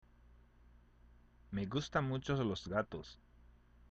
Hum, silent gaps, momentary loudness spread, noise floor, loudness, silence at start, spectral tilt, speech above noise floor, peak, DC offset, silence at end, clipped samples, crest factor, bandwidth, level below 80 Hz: 60 Hz at -60 dBFS; none; 14 LU; -64 dBFS; -39 LUFS; 1.5 s; -6.5 dB/octave; 26 dB; -20 dBFS; under 0.1%; 0.75 s; under 0.1%; 22 dB; 8 kHz; -60 dBFS